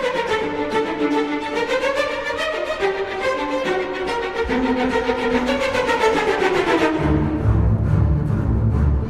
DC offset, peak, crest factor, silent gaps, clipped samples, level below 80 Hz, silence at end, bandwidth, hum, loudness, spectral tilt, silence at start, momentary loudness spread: under 0.1%; -4 dBFS; 14 dB; none; under 0.1%; -28 dBFS; 0 s; 12.5 kHz; none; -20 LUFS; -6.5 dB/octave; 0 s; 5 LU